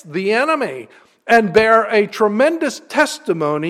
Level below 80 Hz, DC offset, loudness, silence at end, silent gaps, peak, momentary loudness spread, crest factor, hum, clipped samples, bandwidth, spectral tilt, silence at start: -56 dBFS; under 0.1%; -16 LUFS; 0 s; none; 0 dBFS; 10 LU; 16 dB; none; under 0.1%; 15 kHz; -4.5 dB/octave; 0.05 s